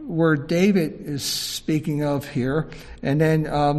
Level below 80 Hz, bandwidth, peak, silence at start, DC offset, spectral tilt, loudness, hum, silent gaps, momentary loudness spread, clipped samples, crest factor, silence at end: -46 dBFS; 14 kHz; -6 dBFS; 0 s; under 0.1%; -5.5 dB/octave; -22 LUFS; none; none; 8 LU; under 0.1%; 16 dB; 0 s